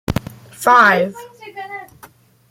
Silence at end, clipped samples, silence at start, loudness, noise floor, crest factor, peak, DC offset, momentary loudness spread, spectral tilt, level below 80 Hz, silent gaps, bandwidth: 0.65 s; under 0.1%; 0.1 s; -14 LUFS; -46 dBFS; 18 dB; 0 dBFS; under 0.1%; 25 LU; -4.5 dB/octave; -44 dBFS; none; 16.5 kHz